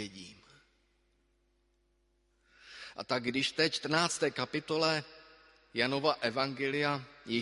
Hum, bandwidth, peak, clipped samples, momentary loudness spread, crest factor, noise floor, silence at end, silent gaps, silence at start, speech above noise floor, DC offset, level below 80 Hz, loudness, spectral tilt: none; 11.5 kHz; -12 dBFS; under 0.1%; 18 LU; 24 dB; -74 dBFS; 0 s; none; 0 s; 41 dB; under 0.1%; -72 dBFS; -32 LUFS; -3.5 dB/octave